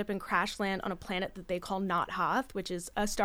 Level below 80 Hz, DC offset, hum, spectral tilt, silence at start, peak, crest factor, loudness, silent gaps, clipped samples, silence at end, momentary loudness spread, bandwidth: -52 dBFS; under 0.1%; none; -4 dB/octave; 0 s; -14 dBFS; 20 dB; -33 LUFS; none; under 0.1%; 0 s; 6 LU; over 20 kHz